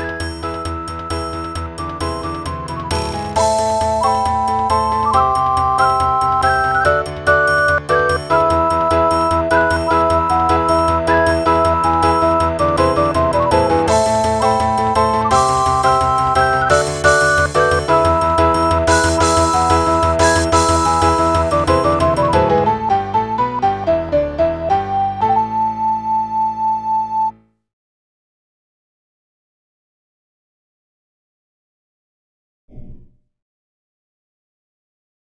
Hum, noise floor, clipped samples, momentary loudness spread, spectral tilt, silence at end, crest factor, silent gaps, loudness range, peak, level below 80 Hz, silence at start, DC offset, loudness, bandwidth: none; -41 dBFS; under 0.1%; 8 LU; -4.5 dB/octave; 2.3 s; 16 dB; 27.73-32.68 s; 7 LU; 0 dBFS; -32 dBFS; 0 s; under 0.1%; -15 LUFS; 11 kHz